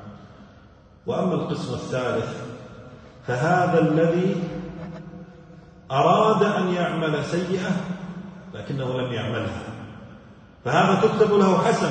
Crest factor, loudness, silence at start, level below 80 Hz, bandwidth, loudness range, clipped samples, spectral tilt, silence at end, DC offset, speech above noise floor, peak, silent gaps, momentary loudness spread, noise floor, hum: 18 dB; -22 LUFS; 0 s; -56 dBFS; 9.2 kHz; 6 LU; under 0.1%; -6.5 dB/octave; 0 s; under 0.1%; 29 dB; -6 dBFS; none; 20 LU; -50 dBFS; none